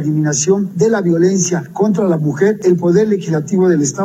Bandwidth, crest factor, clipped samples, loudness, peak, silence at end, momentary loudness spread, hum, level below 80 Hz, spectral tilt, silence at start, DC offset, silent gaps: 13.5 kHz; 12 dB; under 0.1%; -14 LUFS; -2 dBFS; 0 s; 4 LU; none; -56 dBFS; -6 dB/octave; 0 s; under 0.1%; none